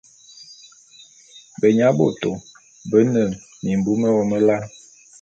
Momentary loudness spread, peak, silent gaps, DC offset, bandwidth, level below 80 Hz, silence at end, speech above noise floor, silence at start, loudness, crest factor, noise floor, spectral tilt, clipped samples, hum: 21 LU; -2 dBFS; none; under 0.1%; 8 kHz; -56 dBFS; 0.55 s; 31 dB; 0.4 s; -19 LUFS; 18 dB; -48 dBFS; -7 dB/octave; under 0.1%; none